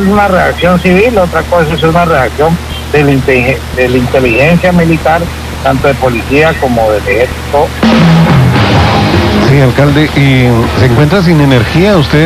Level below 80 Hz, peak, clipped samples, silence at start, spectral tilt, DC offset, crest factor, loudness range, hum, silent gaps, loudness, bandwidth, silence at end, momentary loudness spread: -22 dBFS; 0 dBFS; 2%; 0 s; -6.5 dB/octave; 0.5%; 6 dB; 2 LU; none; none; -7 LUFS; 15 kHz; 0 s; 5 LU